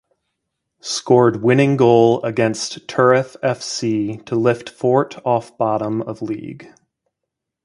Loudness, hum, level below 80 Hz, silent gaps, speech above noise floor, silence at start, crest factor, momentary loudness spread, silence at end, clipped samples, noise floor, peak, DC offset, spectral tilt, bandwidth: -18 LUFS; none; -60 dBFS; none; 63 dB; 0.85 s; 18 dB; 12 LU; 1 s; under 0.1%; -80 dBFS; 0 dBFS; under 0.1%; -5.5 dB/octave; 11.5 kHz